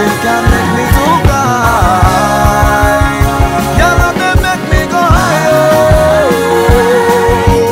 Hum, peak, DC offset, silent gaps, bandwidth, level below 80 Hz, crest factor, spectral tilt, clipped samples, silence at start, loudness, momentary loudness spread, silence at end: none; 0 dBFS; under 0.1%; none; 16.5 kHz; -16 dBFS; 8 dB; -5.5 dB/octave; 0.9%; 0 s; -9 LUFS; 3 LU; 0 s